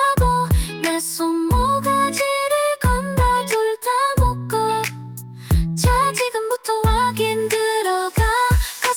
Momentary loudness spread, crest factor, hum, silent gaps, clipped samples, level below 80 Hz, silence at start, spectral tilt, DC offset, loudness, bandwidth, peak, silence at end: 4 LU; 12 dB; none; none; under 0.1%; -28 dBFS; 0 s; -4.5 dB/octave; under 0.1%; -19 LUFS; 19.5 kHz; -6 dBFS; 0 s